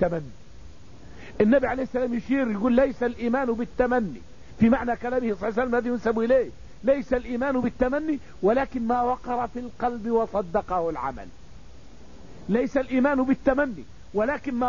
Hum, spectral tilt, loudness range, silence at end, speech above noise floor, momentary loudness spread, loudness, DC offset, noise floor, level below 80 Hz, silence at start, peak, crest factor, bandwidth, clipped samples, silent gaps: none; -7.5 dB/octave; 3 LU; 0 s; 23 dB; 10 LU; -25 LUFS; 0.8%; -48 dBFS; -46 dBFS; 0 s; -8 dBFS; 18 dB; 7.4 kHz; under 0.1%; none